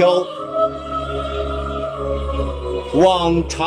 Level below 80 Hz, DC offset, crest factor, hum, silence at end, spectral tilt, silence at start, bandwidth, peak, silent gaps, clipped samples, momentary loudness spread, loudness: -30 dBFS; under 0.1%; 16 dB; none; 0 s; -6 dB/octave; 0 s; 10 kHz; -2 dBFS; none; under 0.1%; 10 LU; -20 LUFS